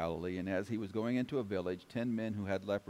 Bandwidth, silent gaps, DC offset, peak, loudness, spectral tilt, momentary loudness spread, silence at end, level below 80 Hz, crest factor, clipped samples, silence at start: 15 kHz; none; under 0.1%; -24 dBFS; -38 LUFS; -7.5 dB/octave; 3 LU; 0.1 s; -66 dBFS; 14 dB; under 0.1%; 0 s